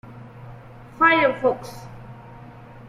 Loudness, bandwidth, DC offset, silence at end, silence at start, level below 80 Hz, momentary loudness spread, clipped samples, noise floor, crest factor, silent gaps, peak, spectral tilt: -19 LUFS; 14.5 kHz; under 0.1%; 0 s; 0.05 s; -54 dBFS; 27 LU; under 0.1%; -42 dBFS; 20 dB; none; -4 dBFS; -5.5 dB/octave